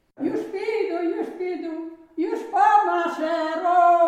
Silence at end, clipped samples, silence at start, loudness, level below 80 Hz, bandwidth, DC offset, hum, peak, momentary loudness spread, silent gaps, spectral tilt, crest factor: 0 s; under 0.1%; 0.2 s; -23 LUFS; -72 dBFS; 9.6 kHz; under 0.1%; none; -6 dBFS; 13 LU; none; -4.5 dB/octave; 16 dB